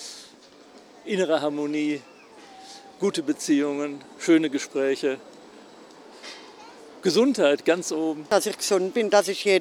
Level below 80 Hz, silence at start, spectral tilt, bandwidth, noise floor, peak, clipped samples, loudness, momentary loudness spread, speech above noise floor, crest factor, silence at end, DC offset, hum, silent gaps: -78 dBFS; 0 s; -3.5 dB/octave; 16 kHz; -50 dBFS; -4 dBFS; under 0.1%; -24 LUFS; 22 LU; 27 dB; 20 dB; 0 s; under 0.1%; none; none